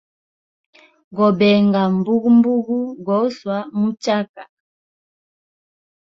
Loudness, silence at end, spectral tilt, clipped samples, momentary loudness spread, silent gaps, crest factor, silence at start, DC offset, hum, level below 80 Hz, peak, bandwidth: -17 LUFS; 1.7 s; -7.5 dB/octave; under 0.1%; 10 LU; 4.29-4.34 s; 16 dB; 1.1 s; under 0.1%; none; -62 dBFS; -4 dBFS; 7.4 kHz